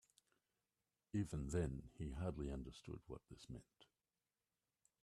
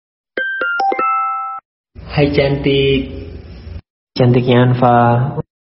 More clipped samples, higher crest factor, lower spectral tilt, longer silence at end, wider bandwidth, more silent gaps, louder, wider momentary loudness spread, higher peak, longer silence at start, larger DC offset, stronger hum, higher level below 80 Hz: neither; about the same, 20 dB vs 16 dB; first, -7 dB/octave vs -5.5 dB/octave; first, 1.2 s vs 0.2 s; first, 12.5 kHz vs 5.8 kHz; second, none vs 1.65-1.84 s, 3.90-4.07 s; second, -48 LUFS vs -14 LUFS; second, 14 LU vs 20 LU; second, -28 dBFS vs 0 dBFS; first, 1.15 s vs 0.35 s; neither; neither; second, -60 dBFS vs -36 dBFS